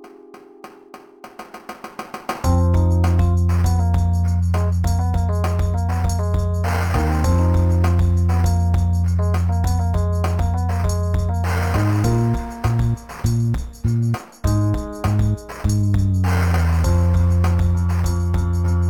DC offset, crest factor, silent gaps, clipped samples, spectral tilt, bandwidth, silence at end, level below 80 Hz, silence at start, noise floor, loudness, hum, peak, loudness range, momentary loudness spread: under 0.1%; 12 dB; none; under 0.1%; -7.5 dB/octave; 12.5 kHz; 0 s; -26 dBFS; 0.05 s; -43 dBFS; -19 LUFS; none; -6 dBFS; 3 LU; 6 LU